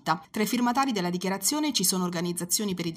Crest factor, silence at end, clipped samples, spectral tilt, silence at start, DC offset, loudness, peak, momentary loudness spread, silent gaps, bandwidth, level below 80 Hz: 18 dB; 0 s; under 0.1%; -3.5 dB/octave; 0.05 s; under 0.1%; -26 LUFS; -8 dBFS; 5 LU; none; 16 kHz; -68 dBFS